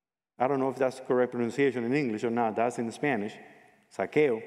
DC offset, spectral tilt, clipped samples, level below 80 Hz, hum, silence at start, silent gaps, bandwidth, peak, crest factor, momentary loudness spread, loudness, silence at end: under 0.1%; -6.5 dB/octave; under 0.1%; -80 dBFS; none; 0.4 s; none; 12 kHz; -12 dBFS; 18 dB; 7 LU; -29 LUFS; 0 s